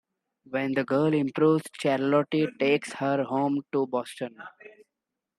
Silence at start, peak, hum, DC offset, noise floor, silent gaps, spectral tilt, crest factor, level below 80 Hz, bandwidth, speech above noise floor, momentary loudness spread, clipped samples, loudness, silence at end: 0.5 s; -10 dBFS; none; under 0.1%; -86 dBFS; none; -6.5 dB/octave; 16 dB; -74 dBFS; 12.5 kHz; 60 dB; 12 LU; under 0.1%; -26 LUFS; 0.7 s